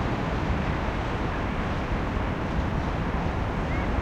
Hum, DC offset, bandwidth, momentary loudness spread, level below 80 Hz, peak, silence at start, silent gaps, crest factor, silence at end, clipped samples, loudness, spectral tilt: none; under 0.1%; 9 kHz; 1 LU; -32 dBFS; -12 dBFS; 0 s; none; 14 dB; 0 s; under 0.1%; -28 LUFS; -7 dB/octave